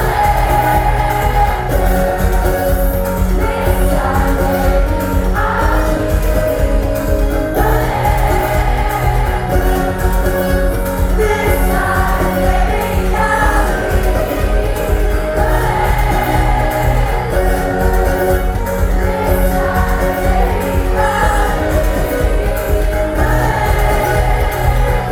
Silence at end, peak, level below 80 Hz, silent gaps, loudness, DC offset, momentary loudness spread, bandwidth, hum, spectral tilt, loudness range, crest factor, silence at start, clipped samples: 0 s; 0 dBFS; -16 dBFS; none; -15 LUFS; under 0.1%; 3 LU; 18 kHz; none; -6 dB/octave; 1 LU; 12 dB; 0 s; under 0.1%